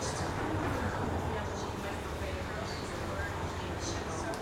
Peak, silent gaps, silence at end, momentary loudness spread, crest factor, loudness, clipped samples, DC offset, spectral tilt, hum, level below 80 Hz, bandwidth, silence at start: -20 dBFS; none; 0 s; 4 LU; 14 dB; -36 LUFS; under 0.1%; under 0.1%; -5 dB/octave; none; -46 dBFS; 16 kHz; 0 s